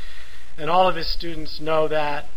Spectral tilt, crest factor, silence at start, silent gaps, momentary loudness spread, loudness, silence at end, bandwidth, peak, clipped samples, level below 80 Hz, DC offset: -5.5 dB/octave; 18 dB; 0 s; none; 15 LU; -23 LUFS; 0 s; 16 kHz; -4 dBFS; under 0.1%; -40 dBFS; 10%